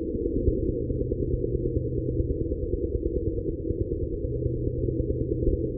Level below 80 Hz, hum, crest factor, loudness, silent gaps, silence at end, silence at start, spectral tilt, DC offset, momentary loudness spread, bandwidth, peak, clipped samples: -32 dBFS; none; 16 dB; -29 LUFS; none; 0 s; 0 s; -22.5 dB/octave; under 0.1%; 3 LU; 0.7 kHz; -12 dBFS; under 0.1%